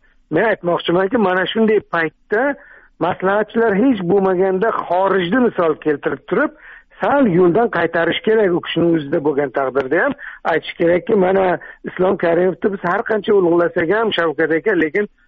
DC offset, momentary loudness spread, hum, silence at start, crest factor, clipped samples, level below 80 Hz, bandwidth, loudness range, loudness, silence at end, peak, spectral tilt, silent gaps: under 0.1%; 6 LU; none; 0.3 s; 12 dB; under 0.1%; -52 dBFS; 4.9 kHz; 1 LU; -17 LUFS; 0.2 s; -4 dBFS; -4.5 dB/octave; none